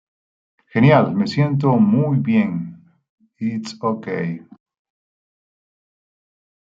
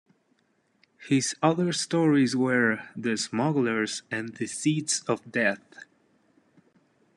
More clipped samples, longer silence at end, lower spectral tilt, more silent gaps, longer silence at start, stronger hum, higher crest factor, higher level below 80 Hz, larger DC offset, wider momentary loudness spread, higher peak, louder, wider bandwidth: neither; first, 2.25 s vs 1.6 s; first, -8.5 dB/octave vs -4.5 dB/octave; first, 3.09-3.18 s vs none; second, 0.75 s vs 1 s; neither; about the same, 18 dB vs 20 dB; first, -60 dBFS vs -74 dBFS; neither; first, 14 LU vs 8 LU; first, -2 dBFS vs -8 dBFS; first, -18 LUFS vs -26 LUFS; second, 7.6 kHz vs 12 kHz